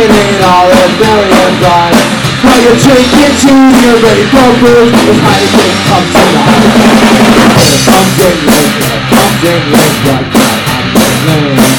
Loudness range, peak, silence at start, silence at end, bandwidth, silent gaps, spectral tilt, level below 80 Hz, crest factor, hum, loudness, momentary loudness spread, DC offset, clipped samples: 3 LU; 0 dBFS; 0 s; 0 s; over 20 kHz; none; -4.5 dB/octave; -28 dBFS; 4 dB; none; -5 LUFS; 4 LU; under 0.1%; 7%